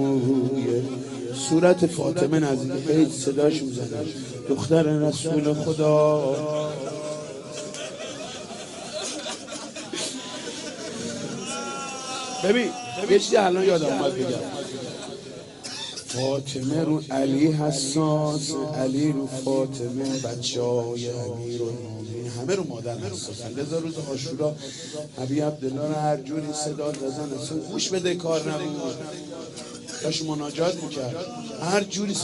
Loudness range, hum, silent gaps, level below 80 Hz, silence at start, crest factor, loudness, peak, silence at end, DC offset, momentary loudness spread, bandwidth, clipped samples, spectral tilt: 8 LU; none; none; -64 dBFS; 0 s; 20 dB; -26 LUFS; -6 dBFS; 0 s; under 0.1%; 13 LU; 11.5 kHz; under 0.1%; -5 dB/octave